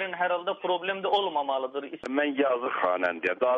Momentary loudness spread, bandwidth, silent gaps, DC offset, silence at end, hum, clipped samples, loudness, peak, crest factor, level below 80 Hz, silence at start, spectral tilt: 5 LU; 8 kHz; none; under 0.1%; 0 s; none; under 0.1%; -28 LUFS; -12 dBFS; 16 dB; -74 dBFS; 0 s; -5 dB/octave